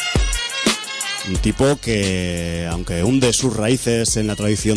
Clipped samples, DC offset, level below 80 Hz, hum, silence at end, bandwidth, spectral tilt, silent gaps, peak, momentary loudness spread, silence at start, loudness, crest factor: under 0.1%; under 0.1%; -30 dBFS; none; 0 s; 11 kHz; -4 dB/octave; none; -2 dBFS; 6 LU; 0 s; -19 LUFS; 16 dB